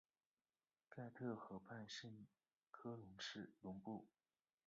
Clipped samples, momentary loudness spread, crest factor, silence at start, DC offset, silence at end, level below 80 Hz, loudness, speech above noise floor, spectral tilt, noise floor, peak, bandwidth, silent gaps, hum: under 0.1%; 12 LU; 20 dB; 0.9 s; under 0.1%; 0.6 s; -86 dBFS; -55 LUFS; over 36 dB; -4 dB/octave; under -90 dBFS; -36 dBFS; 7.4 kHz; 2.57-2.61 s; none